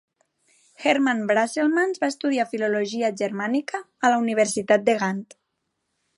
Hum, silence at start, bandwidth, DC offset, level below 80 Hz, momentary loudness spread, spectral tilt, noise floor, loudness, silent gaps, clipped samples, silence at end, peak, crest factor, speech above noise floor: none; 0.8 s; 11.5 kHz; under 0.1%; -76 dBFS; 7 LU; -4 dB/octave; -77 dBFS; -23 LUFS; none; under 0.1%; 0.95 s; -6 dBFS; 18 dB; 55 dB